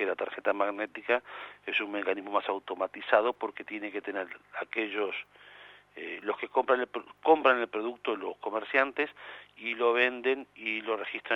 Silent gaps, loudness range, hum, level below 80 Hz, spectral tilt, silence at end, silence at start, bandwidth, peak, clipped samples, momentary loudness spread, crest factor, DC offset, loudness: none; 5 LU; 50 Hz at -75 dBFS; -80 dBFS; -5 dB/octave; 0 s; 0 s; 6 kHz; -8 dBFS; under 0.1%; 14 LU; 24 dB; under 0.1%; -30 LUFS